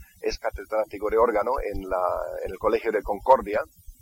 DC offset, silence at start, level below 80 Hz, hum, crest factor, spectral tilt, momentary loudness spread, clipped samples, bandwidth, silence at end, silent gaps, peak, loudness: under 0.1%; 0 s; -42 dBFS; none; 22 dB; -5.5 dB/octave; 10 LU; under 0.1%; 17 kHz; 0.1 s; none; -4 dBFS; -25 LUFS